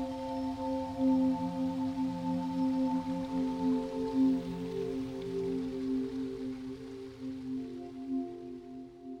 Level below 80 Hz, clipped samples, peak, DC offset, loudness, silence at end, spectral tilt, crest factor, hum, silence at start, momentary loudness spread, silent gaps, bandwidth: -60 dBFS; under 0.1%; -20 dBFS; under 0.1%; -34 LUFS; 0 s; -7.5 dB/octave; 14 dB; none; 0 s; 13 LU; none; 9.2 kHz